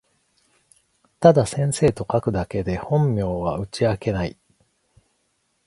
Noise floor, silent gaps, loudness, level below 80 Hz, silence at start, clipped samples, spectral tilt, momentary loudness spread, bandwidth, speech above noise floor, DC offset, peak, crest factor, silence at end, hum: -69 dBFS; none; -21 LUFS; -44 dBFS; 1.2 s; under 0.1%; -6.5 dB/octave; 10 LU; 11.5 kHz; 49 dB; under 0.1%; 0 dBFS; 22 dB; 1.35 s; none